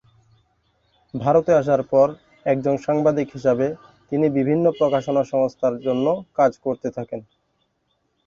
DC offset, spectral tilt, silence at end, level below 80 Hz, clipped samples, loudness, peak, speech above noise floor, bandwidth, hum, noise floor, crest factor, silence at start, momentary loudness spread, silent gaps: under 0.1%; -8 dB/octave; 1.05 s; -58 dBFS; under 0.1%; -21 LUFS; -4 dBFS; 50 dB; 7.2 kHz; none; -70 dBFS; 16 dB; 1.15 s; 11 LU; none